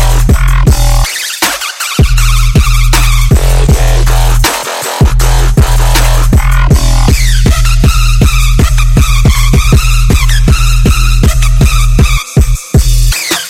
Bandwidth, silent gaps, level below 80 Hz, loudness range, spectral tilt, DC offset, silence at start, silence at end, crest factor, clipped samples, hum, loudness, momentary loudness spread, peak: 16.5 kHz; none; -8 dBFS; 1 LU; -4.5 dB/octave; under 0.1%; 0 s; 0 s; 6 dB; 0.2%; none; -9 LUFS; 2 LU; 0 dBFS